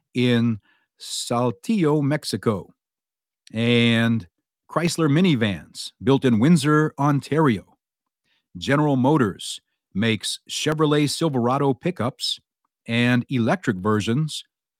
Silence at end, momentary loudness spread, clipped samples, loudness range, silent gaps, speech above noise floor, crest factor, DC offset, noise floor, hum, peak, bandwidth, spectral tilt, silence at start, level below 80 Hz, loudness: 0.4 s; 13 LU; under 0.1%; 3 LU; none; over 69 dB; 16 dB; under 0.1%; under -90 dBFS; none; -6 dBFS; 16 kHz; -5.5 dB/octave; 0.15 s; -62 dBFS; -21 LUFS